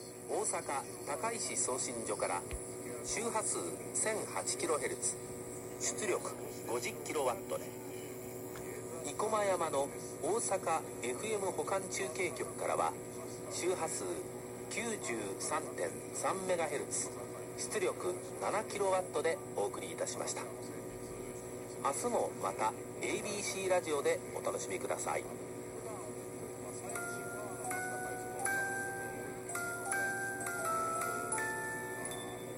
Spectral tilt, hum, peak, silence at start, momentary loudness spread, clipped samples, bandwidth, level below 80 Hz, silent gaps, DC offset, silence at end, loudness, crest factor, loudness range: -3 dB/octave; none; -20 dBFS; 0 s; 10 LU; under 0.1%; 16 kHz; -66 dBFS; none; under 0.1%; 0 s; -37 LUFS; 18 dB; 3 LU